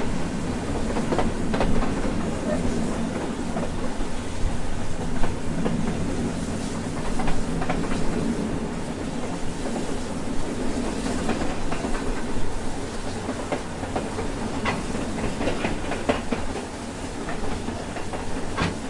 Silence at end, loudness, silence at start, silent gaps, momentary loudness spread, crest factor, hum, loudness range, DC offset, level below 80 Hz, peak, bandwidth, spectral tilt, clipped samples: 0 s; -28 LUFS; 0 s; none; 5 LU; 18 dB; none; 3 LU; under 0.1%; -32 dBFS; -6 dBFS; 11.5 kHz; -5.5 dB/octave; under 0.1%